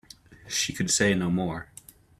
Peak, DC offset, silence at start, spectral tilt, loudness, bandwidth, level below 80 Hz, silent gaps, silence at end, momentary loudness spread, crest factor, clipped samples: -8 dBFS; under 0.1%; 0.3 s; -3.5 dB/octave; -26 LUFS; 15 kHz; -56 dBFS; none; 0.55 s; 14 LU; 20 dB; under 0.1%